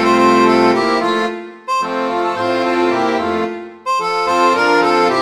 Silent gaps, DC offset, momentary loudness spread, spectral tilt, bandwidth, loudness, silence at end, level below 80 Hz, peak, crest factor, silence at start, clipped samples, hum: none; under 0.1%; 9 LU; -4.5 dB/octave; 13.5 kHz; -15 LUFS; 0 s; -52 dBFS; 0 dBFS; 14 dB; 0 s; under 0.1%; none